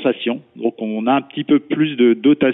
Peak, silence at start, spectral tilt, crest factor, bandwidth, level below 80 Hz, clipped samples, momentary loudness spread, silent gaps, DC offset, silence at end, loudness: -4 dBFS; 0 s; -4.5 dB/octave; 14 dB; 4 kHz; -62 dBFS; under 0.1%; 9 LU; none; under 0.1%; 0 s; -18 LUFS